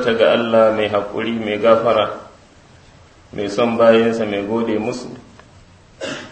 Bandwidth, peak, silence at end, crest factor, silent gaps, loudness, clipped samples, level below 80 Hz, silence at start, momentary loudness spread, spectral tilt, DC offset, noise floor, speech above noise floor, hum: 8.6 kHz; 0 dBFS; 0 s; 18 dB; none; -17 LUFS; under 0.1%; -52 dBFS; 0 s; 17 LU; -5.5 dB/octave; under 0.1%; -46 dBFS; 30 dB; none